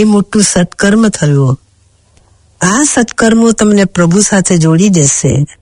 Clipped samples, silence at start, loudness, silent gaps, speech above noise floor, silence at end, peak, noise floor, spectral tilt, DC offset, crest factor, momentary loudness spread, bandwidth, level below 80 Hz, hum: 0.4%; 0 s; -9 LUFS; none; 40 dB; 0.15 s; 0 dBFS; -49 dBFS; -5 dB/octave; under 0.1%; 10 dB; 4 LU; 11 kHz; -38 dBFS; none